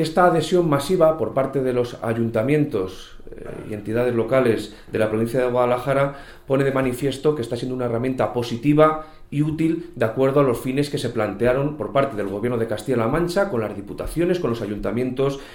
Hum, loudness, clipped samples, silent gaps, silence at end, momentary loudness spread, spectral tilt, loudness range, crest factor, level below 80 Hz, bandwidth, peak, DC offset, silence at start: none; -21 LUFS; under 0.1%; none; 0 s; 9 LU; -7 dB/octave; 2 LU; 18 dB; -44 dBFS; 18 kHz; -2 dBFS; under 0.1%; 0 s